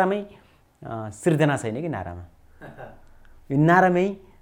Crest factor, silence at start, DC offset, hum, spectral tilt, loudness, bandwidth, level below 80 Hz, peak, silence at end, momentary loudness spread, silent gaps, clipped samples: 20 dB; 0 s; under 0.1%; none; -7 dB/octave; -22 LUFS; 15 kHz; -54 dBFS; -4 dBFS; 0.25 s; 25 LU; none; under 0.1%